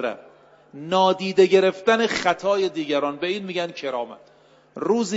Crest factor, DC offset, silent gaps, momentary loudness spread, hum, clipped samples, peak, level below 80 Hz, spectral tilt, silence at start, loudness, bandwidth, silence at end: 18 dB; under 0.1%; none; 14 LU; none; under 0.1%; -4 dBFS; -66 dBFS; -4.5 dB/octave; 0 s; -22 LUFS; 8 kHz; 0 s